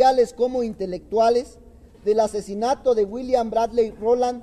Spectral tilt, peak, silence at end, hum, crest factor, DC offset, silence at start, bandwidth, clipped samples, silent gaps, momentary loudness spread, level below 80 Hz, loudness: -5 dB/octave; -6 dBFS; 0 s; none; 16 dB; under 0.1%; 0 s; 12 kHz; under 0.1%; none; 7 LU; -50 dBFS; -22 LUFS